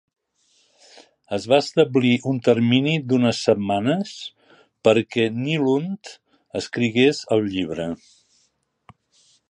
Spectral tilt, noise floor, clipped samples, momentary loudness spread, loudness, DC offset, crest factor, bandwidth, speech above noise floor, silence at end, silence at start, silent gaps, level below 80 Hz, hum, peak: -6 dB/octave; -68 dBFS; under 0.1%; 14 LU; -21 LUFS; under 0.1%; 20 dB; 10.5 kHz; 48 dB; 1.55 s; 1.3 s; none; -60 dBFS; none; -2 dBFS